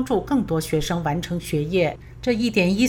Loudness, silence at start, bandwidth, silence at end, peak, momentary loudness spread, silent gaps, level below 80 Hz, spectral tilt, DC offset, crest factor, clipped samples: -23 LUFS; 0 s; over 20 kHz; 0 s; -6 dBFS; 6 LU; none; -42 dBFS; -6 dB/octave; under 0.1%; 16 dB; under 0.1%